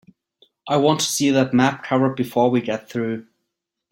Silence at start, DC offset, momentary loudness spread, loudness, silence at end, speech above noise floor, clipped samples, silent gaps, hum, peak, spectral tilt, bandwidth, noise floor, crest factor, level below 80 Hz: 0.65 s; under 0.1%; 9 LU; -20 LUFS; 0.7 s; 60 dB; under 0.1%; none; none; -2 dBFS; -4.5 dB/octave; 16.5 kHz; -80 dBFS; 18 dB; -62 dBFS